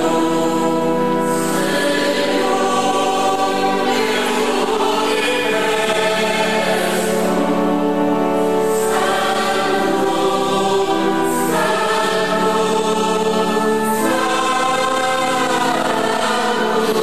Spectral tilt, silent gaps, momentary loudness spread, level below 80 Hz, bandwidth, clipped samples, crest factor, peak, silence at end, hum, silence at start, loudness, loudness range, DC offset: -3.5 dB/octave; none; 1 LU; -58 dBFS; 14 kHz; under 0.1%; 12 dB; -6 dBFS; 0 s; none; 0 s; -17 LUFS; 0 LU; 2%